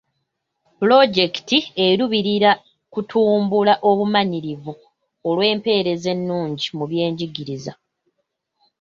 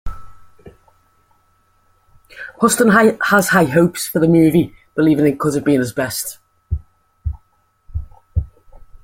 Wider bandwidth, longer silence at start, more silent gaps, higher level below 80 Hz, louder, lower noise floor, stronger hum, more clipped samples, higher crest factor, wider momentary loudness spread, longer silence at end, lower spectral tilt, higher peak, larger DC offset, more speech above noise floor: second, 7.4 kHz vs 16.5 kHz; first, 0.8 s vs 0.05 s; neither; second, -64 dBFS vs -36 dBFS; about the same, -18 LUFS vs -16 LUFS; first, -75 dBFS vs -59 dBFS; neither; neither; about the same, 18 dB vs 18 dB; second, 14 LU vs 19 LU; first, 1.1 s vs 0.1 s; about the same, -5.5 dB/octave vs -5.5 dB/octave; about the same, -2 dBFS vs 0 dBFS; neither; first, 56 dB vs 45 dB